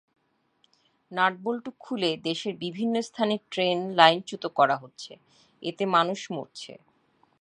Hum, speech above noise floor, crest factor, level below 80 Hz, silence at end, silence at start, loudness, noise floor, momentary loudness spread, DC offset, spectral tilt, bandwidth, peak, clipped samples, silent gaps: none; 42 dB; 28 dB; -78 dBFS; 0.65 s; 1.1 s; -26 LUFS; -69 dBFS; 19 LU; under 0.1%; -4.5 dB/octave; 11 kHz; 0 dBFS; under 0.1%; none